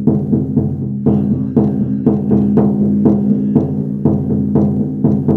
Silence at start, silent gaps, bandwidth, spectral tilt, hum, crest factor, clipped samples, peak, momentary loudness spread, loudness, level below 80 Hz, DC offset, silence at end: 0 s; none; 2.1 kHz; -13 dB/octave; none; 14 dB; under 0.1%; 0 dBFS; 4 LU; -14 LUFS; -42 dBFS; under 0.1%; 0 s